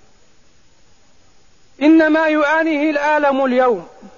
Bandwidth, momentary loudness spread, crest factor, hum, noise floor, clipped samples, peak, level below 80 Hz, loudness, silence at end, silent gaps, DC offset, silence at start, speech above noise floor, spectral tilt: 7.2 kHz; 6 LU; 14 dB; none; -54 dBFS; under 0.1%; -2 dBFS; -58 dBFS; -15 LUFS; 0.1 s; none; 0.4%; 1.8 s; 40 dB; -5 dB/octave